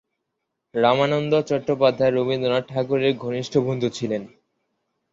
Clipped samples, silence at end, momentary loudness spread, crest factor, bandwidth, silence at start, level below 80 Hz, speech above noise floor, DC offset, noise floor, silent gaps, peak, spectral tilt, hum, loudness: under 0.1%; 0.85 s; 8 LU; 18 dB; 7.8 kHz; 0.75 s; -62 dBFS; 58 dB; under 0.1%; -79 dBFS; none; -4 dBFS; -6.5 dB/octave; none; -22 LUFS